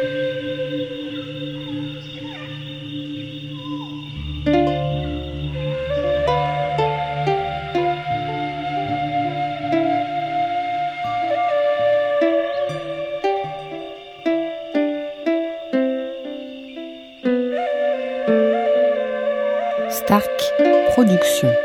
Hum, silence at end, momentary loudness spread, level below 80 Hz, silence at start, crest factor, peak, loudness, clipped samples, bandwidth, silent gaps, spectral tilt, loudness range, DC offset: none; 0 s; 13 LU; -44 dBFS; 0 s; 20 dB; -2 dBFS; -21 LUFS; under 0.1%; 18 kHz; none; -5.5 dB/octave; 6 LU; under 0.1%